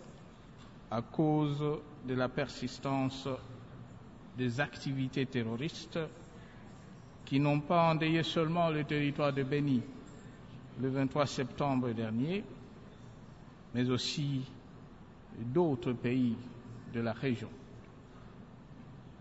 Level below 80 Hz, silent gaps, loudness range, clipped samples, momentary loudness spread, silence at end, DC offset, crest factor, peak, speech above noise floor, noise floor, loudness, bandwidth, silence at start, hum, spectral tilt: -62 dBFS; none; 6 LU; under 0.1%; 22 LU; 0 s; under 0.1%; 18 dB; -18 dBFS; 20 dB; -53 dBFS; -34 LUFS; 7.6 kHz; 0 s; none; -5.5 dB/octave